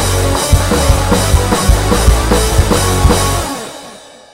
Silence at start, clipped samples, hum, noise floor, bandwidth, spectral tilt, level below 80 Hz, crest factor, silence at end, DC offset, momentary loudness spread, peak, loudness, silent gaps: 0 s; 0.4%; none; -35 dBFS; 16.5 kHz; -4.5 dB/octave; -16 dBFS; 12 dB; 0.35 s; under 0.1%; 10 LU; 0 dBFS; -12 LUFS; none